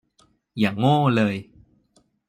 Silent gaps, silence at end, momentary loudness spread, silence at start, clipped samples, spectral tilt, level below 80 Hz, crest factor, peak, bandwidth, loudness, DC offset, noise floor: none; 0.85 s; 14 LU; 0.55 s; under 0.1%; -7.5 dB/octave; -62 dBFS; 18 dB; -6 dBFS; 15 kHz; -21 LUFS; under 0.1%; -63 dBFS